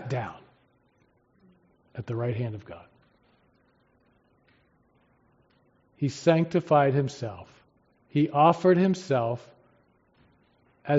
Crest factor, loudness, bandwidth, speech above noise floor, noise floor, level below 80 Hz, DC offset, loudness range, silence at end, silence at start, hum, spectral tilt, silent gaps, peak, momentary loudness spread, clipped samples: 22 dB; -25 LUFS; 7.6 kHz; 42 dB; -67 dBFS; -68 dBFS; under 0.1%; 14 LU; 0 s; 0 s; none; -6.5 dB/octave; none; -6 dBFS; 21 LU; under 0.1%